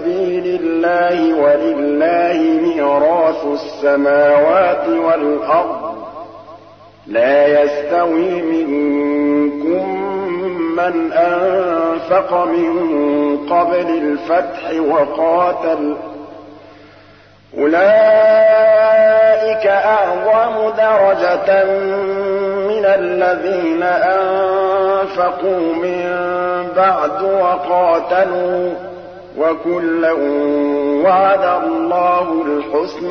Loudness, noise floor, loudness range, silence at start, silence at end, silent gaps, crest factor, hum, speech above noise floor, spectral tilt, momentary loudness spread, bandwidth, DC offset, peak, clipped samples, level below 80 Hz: -14 LUFS; -44 dBFS; 5 LU; 0 s; 0 s; none; 12 dB; none; 31 dB; -7 dB/octave; 8 LU; 6.4 kHz; 0.1%; -2 dBFS; under 0.1%; -58 dBFS